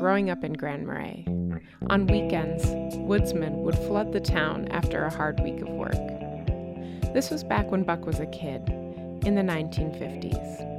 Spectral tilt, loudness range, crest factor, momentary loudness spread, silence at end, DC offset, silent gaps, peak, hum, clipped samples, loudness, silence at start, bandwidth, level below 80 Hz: -7 dB/octave; 3 LU; 18 dB; 8 LU; 0 s; under 0.1%; none; -10 dBFS; none; under 0.1%; -28 LUFS; 0 s; 15.5 kHz; -38 dBFS